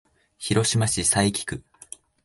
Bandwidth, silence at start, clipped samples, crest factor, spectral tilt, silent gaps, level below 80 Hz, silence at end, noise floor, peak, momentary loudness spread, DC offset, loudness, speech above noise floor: 12 kHz; 0.4 s; under 0.1%; 18 dB; -3.5 dB/octave; none; -48 dBFS; 0.65 s; -46 dBFS; -8 dBFS; 22 LU; under 0.1%; -22 LUFS; 23 dB